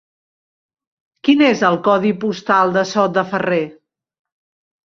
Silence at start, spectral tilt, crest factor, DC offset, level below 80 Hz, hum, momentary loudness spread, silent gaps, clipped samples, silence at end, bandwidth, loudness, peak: 1.25 s; -5.5 dB/octave; 18 dB; under 0.1%; -62 dBFS; none; 8 LU; none; under 0.1%; 1.15 s; 7.4 kHz; -16 LUFS; -2 dBFS